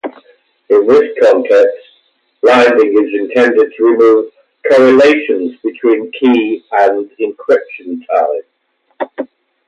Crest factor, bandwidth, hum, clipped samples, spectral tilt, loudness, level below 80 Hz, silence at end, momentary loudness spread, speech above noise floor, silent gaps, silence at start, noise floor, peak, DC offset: 12 dB; 8.6 kHz; none; under 0.1%; -5 dB/octave; -11 LUFS; -60 dBFS; 0.45 s; 16 LU; 51 dB; none; 0.05 s; -61 dBFS; 0 dBFS; under 0.1%